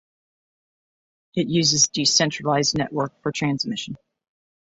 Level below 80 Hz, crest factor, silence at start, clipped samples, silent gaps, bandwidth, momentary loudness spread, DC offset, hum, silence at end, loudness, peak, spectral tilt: -60 dBFS; 20 dB; 1.35 s; under 0.1%; none; 8.2 kHz; 14 LU; under 0.1%; none; 0.7 s; -21 LUFS; -4 dBFS; -3 dB/octave